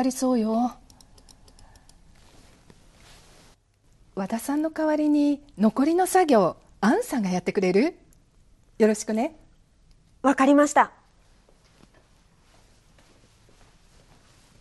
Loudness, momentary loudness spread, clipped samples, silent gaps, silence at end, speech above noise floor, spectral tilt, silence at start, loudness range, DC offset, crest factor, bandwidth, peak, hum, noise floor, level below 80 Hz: -23 LUFS; 9 LU; under 0.1%; none; 3.7 s; 38 dB; -5.5 dB/octave; 0 s; 10 LU; under 0.1%; 20 dB; 12.5 kHz; -6 dBFS; none; -60 dBFS; -58 dBFS